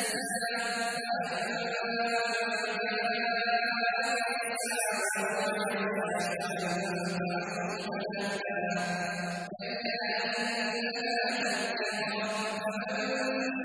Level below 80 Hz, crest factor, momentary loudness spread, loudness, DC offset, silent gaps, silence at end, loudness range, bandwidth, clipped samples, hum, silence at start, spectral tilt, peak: -76 dBFS; 14 dB; 5 LU; -31 LUFS; under 0.1%; none; 0 s; 3 LU; 11 kHz; under 0.1%; none; 0 s; -3 dB/octave; -18 dBFS